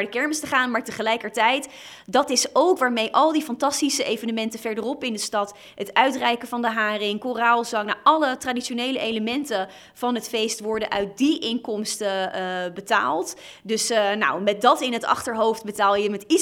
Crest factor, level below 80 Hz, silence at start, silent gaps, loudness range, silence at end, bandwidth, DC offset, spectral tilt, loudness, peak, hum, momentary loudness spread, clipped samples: 20 dB; -64 dBFS; 0 s; none; 4 LU; 0 s; 18 kHz; under 0.1%; -2.5 dB/octave; -23 LUFS; -2 dBFS; none; 8 LU; under 0.1%